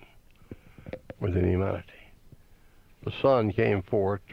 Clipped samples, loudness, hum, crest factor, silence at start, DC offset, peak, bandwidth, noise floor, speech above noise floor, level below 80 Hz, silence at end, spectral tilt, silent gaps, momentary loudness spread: under 0.1%; -27 LUFS; none; 18 dB; 0.5 s; under 0.1%; -10 dBFS; 5.8 kHz; -55 dBFS; 30 dB; -50 dBFS; 0 s; -9 dB/octave; none; 21 LU